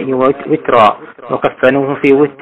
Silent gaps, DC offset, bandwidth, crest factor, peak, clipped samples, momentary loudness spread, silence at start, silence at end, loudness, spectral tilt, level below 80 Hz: none; under 0.1%; 7.6 kHz; 12 dB; 0 dBFS; under 0.1%; 7 LU; 0 s; 0.1 s; -12 LUFS; -7.5 dB/octave; -48 dBFS